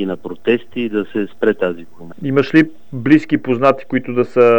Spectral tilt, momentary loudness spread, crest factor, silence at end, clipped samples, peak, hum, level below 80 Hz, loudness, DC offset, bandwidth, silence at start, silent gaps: -8 dB/octave; 10 LU; 16 dB; 0 s; under 0.1%; 0 dBFS; none; -60 dBFS; -17 LUFS; 2%; 18 kHz; 0 s; none